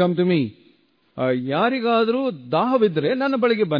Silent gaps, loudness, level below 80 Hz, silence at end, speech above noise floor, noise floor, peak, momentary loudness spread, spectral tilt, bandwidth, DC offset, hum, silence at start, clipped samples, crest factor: none; -21 LUFS; -68 dBFS; 0 s; 39 dB; -59 dBFS; -6 dBFS; 5 LU; -9 dB/octave; 5.2 kHz; under 0.1%; none; 0 s; under 0.1%; 14 dB